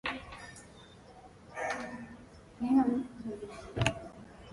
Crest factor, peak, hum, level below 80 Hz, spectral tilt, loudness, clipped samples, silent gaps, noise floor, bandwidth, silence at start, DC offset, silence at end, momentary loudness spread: 26 dB; -10 dBFS; none; -56 dBFS; -5.5 dB/octave; -34 LUFS; under 0.1%; none; -54 dBFS; 11.5 kHz; 0.05 s; under 0.1%; 0 s; 26 LU